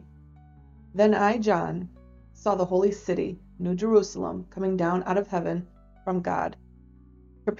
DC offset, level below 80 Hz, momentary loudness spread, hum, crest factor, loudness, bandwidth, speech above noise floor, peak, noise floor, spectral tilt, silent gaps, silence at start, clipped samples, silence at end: under 0.1%; -54 dBFS; 12 LU; none; 18 dB; -26 LUFS; 7.6 kHz; 27 dB; -8 dBFS; -52 dBFS; -7 dB/octave; none; 0.95 s; under 0.1%; 0 s